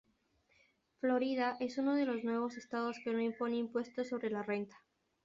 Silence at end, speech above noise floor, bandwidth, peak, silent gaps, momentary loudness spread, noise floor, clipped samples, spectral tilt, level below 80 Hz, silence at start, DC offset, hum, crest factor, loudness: 0.5 s; 39 dB; 7.6 kHz; -22 dBFS; none; 6 LU; -76 dBFS; under 0.1%; -4 dB/octave; -80 dBFS; 1.05 s; under 0.1%; none; 16 dB; -37 LUFS